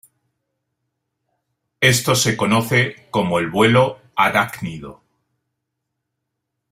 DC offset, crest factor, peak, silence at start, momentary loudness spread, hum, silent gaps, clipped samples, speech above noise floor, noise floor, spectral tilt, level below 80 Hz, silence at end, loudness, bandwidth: under 0.1%; 20 dB; 0 dBFS; 1.8 s; 10 LU; none; none; under 0.1%; 61 dB; -78 dBFS; -4 dB/octave; -54 dBFS; 1.8 s; -17 LUFS; 16 kHz